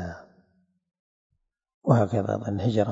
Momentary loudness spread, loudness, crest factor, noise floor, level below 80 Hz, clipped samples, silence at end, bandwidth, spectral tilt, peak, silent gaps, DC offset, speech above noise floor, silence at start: 15 LU; -25 LUFS; 24 dB; -68 dBFS; -60 dBFS; under 0.1%; 0 s; 7.8 kHz; -8.5 dB/octave; -4 dBFS; 0.99-1.30 s, 1.74-1.81 s; under 0.1%; 45 dB; 0 s